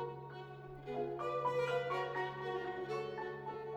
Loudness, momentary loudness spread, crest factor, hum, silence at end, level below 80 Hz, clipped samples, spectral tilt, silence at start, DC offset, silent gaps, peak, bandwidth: -40 LUFS; 13 LU; 14 dB; none; 0 s; -70 dBFS; under 0.1%; -6 dB/octave; 0 s; under 0.1%; none; -26 dBFS; 13.5 kHz